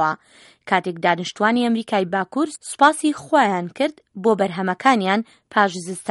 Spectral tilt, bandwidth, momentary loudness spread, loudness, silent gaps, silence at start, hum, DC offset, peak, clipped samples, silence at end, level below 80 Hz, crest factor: -4.5 dB/octave; 11.5 kHz; 8 LU; -20 LUFS; none; 0 s; none; under 0.1%; 0 dBFS; under 0.1%; 0 s; -68 dBFS; 20 dB